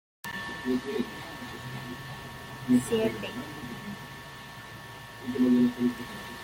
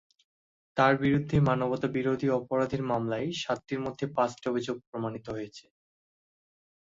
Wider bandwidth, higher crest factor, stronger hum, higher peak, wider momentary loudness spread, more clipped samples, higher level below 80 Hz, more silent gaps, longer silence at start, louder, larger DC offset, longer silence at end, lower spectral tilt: first, 16.5 kHz vs 7.8 kHz; about the same, 18 dB vs 22 dB; neither; about the same, -12 dBFS vs -10 dBFS; first, 18 LU vs 11 LU; neither; about the same, -58 dBFS vs -58 dBFS; second, none vs 4.87-4.93 s; second, 0.25 s vs 0.75 s; about the same, -31 LUFS vs -29 LUFS; neither; second, 0 s vs 1.25 s; second, -5.5 dB/octave vs -7 dB/octave